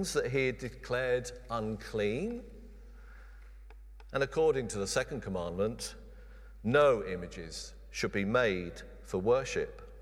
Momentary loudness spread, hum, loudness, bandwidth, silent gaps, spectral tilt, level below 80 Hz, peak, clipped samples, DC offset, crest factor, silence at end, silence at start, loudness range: 14 LU; none; -33 LUFS; 15 kHz; none; -5 dB/octave; -50 dBFS; -14 dBFS; under 0.1%; under 0.1%; 20 dB; 0 s; 0 s; 5 LU